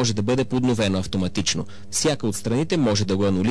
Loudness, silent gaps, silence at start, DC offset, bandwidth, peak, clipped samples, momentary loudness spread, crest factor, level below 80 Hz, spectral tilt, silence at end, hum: -22 LUFS; none; 0 s; 2%; 11 kHz; -10 dBFS; under 0.1%; 4 LU; 10 dB; -48 dBFS; -5 dB/octave; 0 s; none